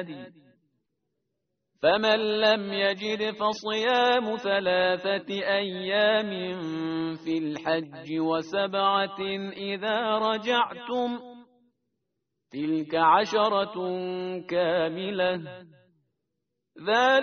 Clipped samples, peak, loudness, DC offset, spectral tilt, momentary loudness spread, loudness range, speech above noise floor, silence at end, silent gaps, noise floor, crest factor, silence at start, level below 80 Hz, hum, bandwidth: under 0.1%; -8 dBFS; -26 LUFS; under 0.1%; -2 dB/octave; 10 LU; 4 LU; 56 dB; 0 s; none; -82 dBFS; 20 dB; 0 s; -70 dBFS; none; 6.6 kHz